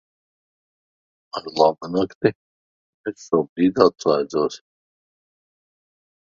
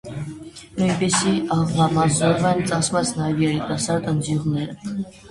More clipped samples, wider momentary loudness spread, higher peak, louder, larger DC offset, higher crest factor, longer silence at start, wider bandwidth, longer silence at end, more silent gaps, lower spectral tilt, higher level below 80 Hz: neither; first, 16 LU vs 13 LU; first, 0 dBFS vs -4 dBFS; about the same, -21 LUFS vs -21 LUFS; neither; first, 24 dB vs 16 dB; first, 1.35 s vs 0.05 s; second, 7.6 kHz vs 11.5 kHz; first, 1.75 s vs 0 s; first, 2.15-2.21 s, 2.35-3.04 s, 3.49-3.56 s vs none; about the same, -6 dB/octave vs -5 dB/octave; second, -62 dBFS vs -48 dBFS